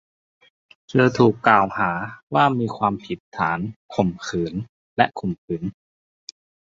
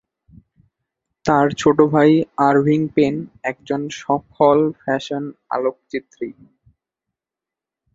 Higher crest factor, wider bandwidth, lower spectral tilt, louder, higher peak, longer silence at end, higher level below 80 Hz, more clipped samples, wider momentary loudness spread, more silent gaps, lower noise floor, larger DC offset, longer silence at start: about the same, 20 dB vs 18 dB; about the same, 7.6 kHz vs 7.8 kHz; about the same, -6.5 dB/octave vs -6.5 dB/octave; second, -22 LUFS vs -18 LUFS; about the same, -2 dBFS vs -2 dBFS; second, 0.95 s vs 1.6 s; about the same, -54 dBFS vs -56 dBFS; neither; first, 16 LU vs 13 LU; first, 2.23-2.27 s, 3.20-3.32 s, 3.76-3.89 s, 4.69-4.96 s, 5.38-5.48 s vs none; about the same, under -90 dBFS vs -87 dBFS; neither; second, 0.9 s vs 1.25 s